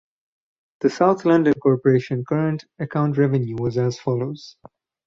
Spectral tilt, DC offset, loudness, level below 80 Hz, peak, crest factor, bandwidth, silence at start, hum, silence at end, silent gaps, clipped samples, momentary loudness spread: -8 dB/octave; under 0.1%; -21 LUFS; -58 dBFS; -4 dBFS; 18 dB; 7.6 kHz; 0.85 s; none; 0.55 s; none; under 0.1%; 9 LU